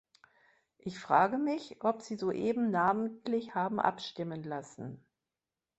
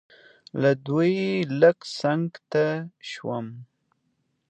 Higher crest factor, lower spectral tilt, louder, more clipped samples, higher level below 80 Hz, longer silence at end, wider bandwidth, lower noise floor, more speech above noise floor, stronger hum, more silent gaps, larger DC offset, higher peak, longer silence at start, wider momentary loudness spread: about the same, 22 dB vs 20 dB; about the same, -6 dB/octave vs -7 dB/octave; second, -32 LUFS vs -24 LUFS; neither; about the same, -74 dBFS vs -72 dBFS; about the same, 0.8 s vs 0.85 s; about the same, 8.2 kHz vs 8.8 kHz; first, under -90 dBFS vs -73 dBFS; first, over 58 dB vs 49 dB; neither; neither; neither; second, -12 dBFS vs -6 dBFS; first, 0.85 s vs 0.55 s; about the same, 16 LU vs 14 LU